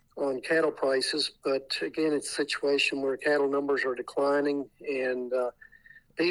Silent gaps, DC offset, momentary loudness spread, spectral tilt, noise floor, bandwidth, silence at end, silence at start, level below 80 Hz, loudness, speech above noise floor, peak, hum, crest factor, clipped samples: none; under 0.1%; 6 LU; -3 dB/octave; -56 dBFS; 12.5 kHz; 0 s; 0.15 s; -70 dBFS; -28 LUFS; 28 dB; -14 dBFS; none; 14 dB; under 0.1%